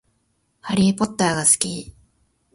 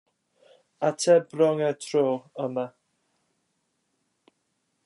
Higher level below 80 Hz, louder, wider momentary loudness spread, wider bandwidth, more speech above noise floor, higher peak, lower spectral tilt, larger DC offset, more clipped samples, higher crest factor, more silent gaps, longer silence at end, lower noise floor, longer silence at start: first, -52 dBFS vs -84 dBFS; first, -19 LUFS vs -25 LUFS; first, 14 LU vs 11 LU; about the same, 11.5 kHz vs 11.5 kHz; about the same, 48 dB vs 51 dB; first, -2 dBFS vs -8 dBFS; second, -3.5 dB/octave vs -5 dB/octave; neither; neither; about the same, 22 dB vs 18 dB; neither; second, 0.65 s vs 2.15 s; second, -68 dBFS vs -75 dBFS; second, 0.65 s vs 0.8 s